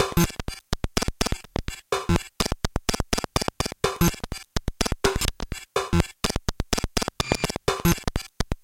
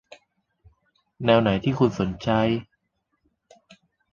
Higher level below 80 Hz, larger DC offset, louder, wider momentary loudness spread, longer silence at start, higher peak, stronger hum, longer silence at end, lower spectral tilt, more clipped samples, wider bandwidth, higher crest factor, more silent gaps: first, -32 dBFS vs -52 dBFS; neither; second, -27 LUFS vs -23 LUFS; about the same, 8 LU vs 8 LU; second, 0 s vs 1.2 s; first, 0 dBFS vs -4 dBFS; neither; second, 0.1 s vs 1.5 s; second, -4 dB/octave vs -7.5 dB/octave; neither; first, 17 kHz vs 7.4 kHz; about the same, 26 dB vs 22 dB; neither